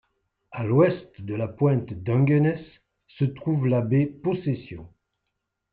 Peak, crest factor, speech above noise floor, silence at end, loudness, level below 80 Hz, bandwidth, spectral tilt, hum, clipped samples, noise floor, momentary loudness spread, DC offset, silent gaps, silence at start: -8 dBFS; 18 dB; 57 dB; 0.85 s; -24 LUFS; -60 dBFS; 4.5 kHz; -12 dB/octave; none; under 0.1%; -80 dBFS; 14 LU; under 0.1%; none; 0.5 s